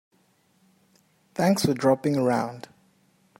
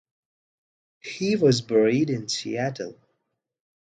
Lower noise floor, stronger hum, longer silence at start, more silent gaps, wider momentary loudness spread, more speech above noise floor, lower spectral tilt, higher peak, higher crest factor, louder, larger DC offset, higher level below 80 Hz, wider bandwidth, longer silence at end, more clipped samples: second, -65 dBFS vs -78 dBFS; neither; first, 1.4 s vs 1.05 s; neither; second, 14 LU vs 17 LU; second, 42 dB vs 55 dB; about the same, -6 dB/octave vs -5.5 dB/octave; about the same, -8 dBFS vs -8 dBFS; about the same, 18 dB vs 18 dB; about the same, -24 LUFS vs -23 LUFS; neither; about the same, -66 dBFS vs -66 dBFS; first, 16 kHz vs 9.4 kHz; about the same, 0.8 s vs 0.9 s; neither